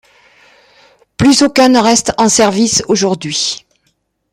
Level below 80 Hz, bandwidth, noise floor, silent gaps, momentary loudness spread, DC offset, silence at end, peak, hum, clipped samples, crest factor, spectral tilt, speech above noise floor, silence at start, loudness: -46 dBFS; 15.5 kHz; -62 dBFS; none; 8 LU; under 0.1%; 0.75 s; 0 dBFS; none; under 0.1%; 14 dB; -3 dB/octave; 51 dB; 1.2 s; -11 LUFS